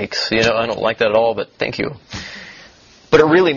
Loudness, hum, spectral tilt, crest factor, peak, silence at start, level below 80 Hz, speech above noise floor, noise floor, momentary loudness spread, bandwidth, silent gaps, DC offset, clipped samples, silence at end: -16 LUFS; none; -5 dB/octave; 18 dB; 0 dBFS; 0 s; -48 dBFS; 30 dB; -46 dBFS; 18 LU; 7.2 kHz; none; under 0.1%; under 0.1%; 0 s